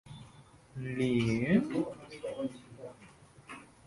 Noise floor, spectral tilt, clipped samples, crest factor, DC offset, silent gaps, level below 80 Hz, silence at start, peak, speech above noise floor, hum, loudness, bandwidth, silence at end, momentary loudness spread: -57 dBFS; -7 dB/octave; under 0.1%; 20 dB; under 0.1%; none; -62 dBFS; 0.05 s; -14 dBFS; 26 dB; none; -33 LUFS; 11.5 kHz; 0.2 s; 21 LU